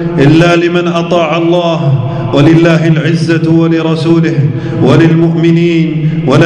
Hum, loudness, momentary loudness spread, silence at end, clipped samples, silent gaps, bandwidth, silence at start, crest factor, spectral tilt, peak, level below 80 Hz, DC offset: none; -8 LUFS; 6 LU; 0 s; 3%; none; 9.4 kHz; 0 s; 8 dB; -7.5 dB/octave; 0 dBFS; -38 dBFS; under 0.1%